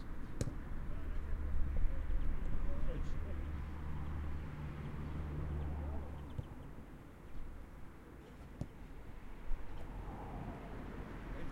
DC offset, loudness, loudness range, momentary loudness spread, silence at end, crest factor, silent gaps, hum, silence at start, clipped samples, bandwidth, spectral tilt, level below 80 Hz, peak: under 0.1%; -46 LUFS; 8 LU; 12 LU; 0 s; 18 dB; none; none; 0 s; under 0.1%; 8.4 kHz; -7.5 dB/octave; -42 dBFS; -20 dBFS